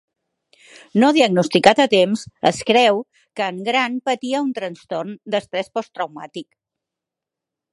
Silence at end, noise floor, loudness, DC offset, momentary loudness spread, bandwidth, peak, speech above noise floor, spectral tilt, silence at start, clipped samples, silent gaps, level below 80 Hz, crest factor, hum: 1.3 s; -85 dBFS; -19 LUFS; under 0.1%; 14 LU; 11.5 kHz; 0 dBFS; 67 dB; -4.5 dB/octave; 0.95 s; under 0.1%; none; -62 dBFS; 20 dB; none